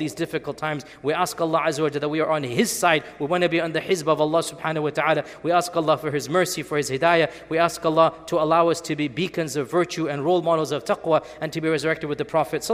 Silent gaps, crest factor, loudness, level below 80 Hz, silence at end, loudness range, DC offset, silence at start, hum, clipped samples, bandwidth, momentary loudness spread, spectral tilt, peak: none; 20 dB; -23 LUFS; -60 dBFS; 0 s; 2 LU; under 0.1%; 0 s; none; under 0.1%; 16 kHz; 7 LU; -4.5 dB/octave; -4 dBFS